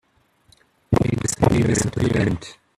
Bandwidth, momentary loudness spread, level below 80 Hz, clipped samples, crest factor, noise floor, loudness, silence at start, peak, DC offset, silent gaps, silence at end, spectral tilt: 14 kHz; 5 LU; -40 dBFS; under 0.1%; 20 dB; -60 dBFS; -21 LUFS; 0.9 s; -2 dBFS; under 0.1%; none; 0.25 s; -6 dB/octave